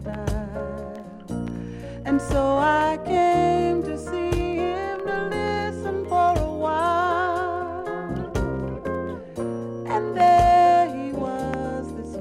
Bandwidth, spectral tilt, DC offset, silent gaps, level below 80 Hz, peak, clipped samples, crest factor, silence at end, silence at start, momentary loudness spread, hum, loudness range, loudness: 13 kHz; -6.5 dB/octave; under 0.1%; none; -38 dBFS; -6 dBFS; under 0.1%; 16 dB; 0 s; 0 s; 14 LU; none; 4 LU; -23 LUFS